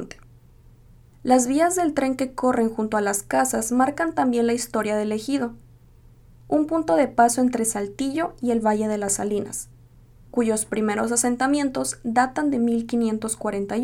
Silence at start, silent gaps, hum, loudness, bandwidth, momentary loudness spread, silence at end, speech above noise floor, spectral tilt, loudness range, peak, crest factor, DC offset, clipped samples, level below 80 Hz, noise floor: 0 s; none; none; -23 LUFS; 17 kHz; 7 LU; 0 s; 28 dB; -4 dB/octave; 2 LU; -4 dBFS; 20 dB; under 0.1%; under 0.1%; -52 dBFS; -50 dBFS